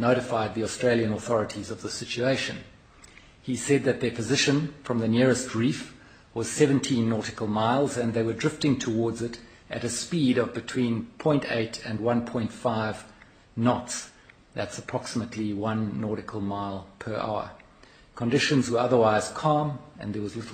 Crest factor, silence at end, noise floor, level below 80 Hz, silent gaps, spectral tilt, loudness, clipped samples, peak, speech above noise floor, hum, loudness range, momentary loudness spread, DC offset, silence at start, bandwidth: 20 dB; 0 s; -54 dBFS; -58 dBFS; none; -5 dB/octave; -27 LUFS; under 0.1%; -6 dBFS; 28 dB; none; 5 LU; 12 LU; under 0.1%; 0 s; 15 kHz